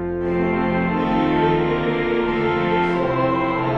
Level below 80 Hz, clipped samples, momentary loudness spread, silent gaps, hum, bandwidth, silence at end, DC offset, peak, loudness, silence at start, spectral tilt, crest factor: -40 dBFS; under 0.1%; 2 LU; none; none; 6.6 kHz; 0 s; 0.3%; -6 dBFS; -20 LUFS; 0 s; -8.5 dB/octave; 14 dB